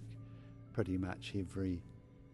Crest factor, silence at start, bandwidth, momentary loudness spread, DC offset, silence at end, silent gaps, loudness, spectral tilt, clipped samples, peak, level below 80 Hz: 20 dB; 0 s; 12 kHz; 17 LU; under 0.1%; 0 s; none; -41 LUFS; -7.5 dB/octave; under 0.1%; -22 dBFS; -62 dBFS